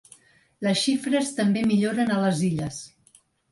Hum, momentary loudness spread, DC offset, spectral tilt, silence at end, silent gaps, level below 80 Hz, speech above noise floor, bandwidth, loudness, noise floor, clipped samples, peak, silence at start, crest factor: none; 10 LU; under 0.1%; -5 dB/octave; 0.65 s; none; -60 dBFS; 37 dB; 11.5 kHz; -24 LUFS; -60 dBFS; under 0.1%; -10 dBFS; 0.6 s; 14 dB